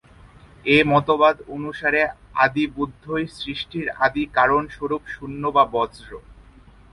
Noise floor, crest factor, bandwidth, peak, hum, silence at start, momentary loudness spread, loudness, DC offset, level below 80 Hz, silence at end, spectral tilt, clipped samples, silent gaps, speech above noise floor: -48 dBFS; 20 dB; 11.5 kHz; -2 dBFS; none; 0.65 s; 12 LU; -21 LUFS; under 0.1%; -48 dBFS; 0.6 s; -6.5 dB/octave; under 0.1%; none; 27 dB